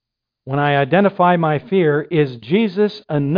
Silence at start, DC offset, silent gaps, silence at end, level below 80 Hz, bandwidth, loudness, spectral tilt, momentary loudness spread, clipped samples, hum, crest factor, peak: 0.45 s; under 0.1%; none; 0 s; -56 dBFS; 5.2 kHz; -17 LUFS; -9.5 dB/octave; 6 LU; under 0.1%; none; 16 dB; -2 dBFS